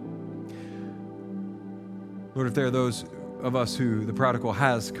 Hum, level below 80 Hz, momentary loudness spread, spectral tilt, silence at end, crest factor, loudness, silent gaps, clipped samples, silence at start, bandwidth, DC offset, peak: none; -62 dBFS; 15 LU; -6 dB/octave; 0 s; 24 dB; -28 LUFS; none; under 0.1%; 0 s; 15 kHz; under 0.1%; -6 dBFS